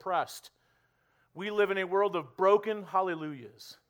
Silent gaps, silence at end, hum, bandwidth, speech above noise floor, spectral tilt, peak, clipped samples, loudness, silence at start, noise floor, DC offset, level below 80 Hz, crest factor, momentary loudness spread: none; 0.15 s; none; 19.5 kHz; 41 dB; -5 dB/octave; -12 dBFS; under 0.1%; -30 LUFS; 0.05 s; -71 dBFS; under 0.1%; -80 dBFS; 20 dB; 17 LU